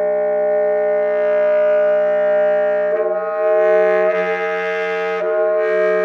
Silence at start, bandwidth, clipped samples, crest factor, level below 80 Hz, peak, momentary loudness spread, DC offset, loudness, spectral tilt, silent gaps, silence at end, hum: 0 s; 6.2 kHz; under 0.1%; 12 dB; -84 dBFS; -4 dBFS; 6 LU; under 0.1%; -16 LUFS; -6 dB/octave; none; 0 s; none